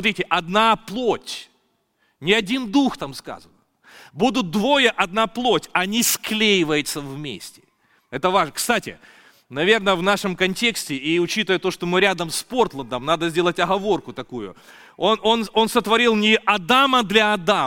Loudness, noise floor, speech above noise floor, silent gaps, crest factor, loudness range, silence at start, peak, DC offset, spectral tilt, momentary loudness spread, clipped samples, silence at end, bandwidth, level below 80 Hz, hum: -19 LUFS; -67 dBFS; 46 dB; none; 18 dB; 4 LU; 0 s; -2 dBFS; under 0.1%; -3.5 dB/octave; 15 LU; under 0.1%; 0 s; 17 kHz; -52 dBFS; none